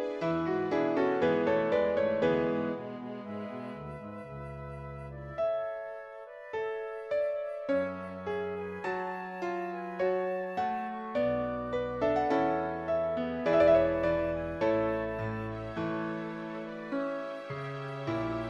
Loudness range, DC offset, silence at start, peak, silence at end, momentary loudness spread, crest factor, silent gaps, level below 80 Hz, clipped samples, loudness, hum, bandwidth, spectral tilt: 9 LU; under 0.1%; 0 s; -14 dBFS; 0 s; 13 LU; 18 dB; none; -56 dBFS; under 0.1%; -32 LUFS; none; 7.8 kHz; -7.5 dB/octave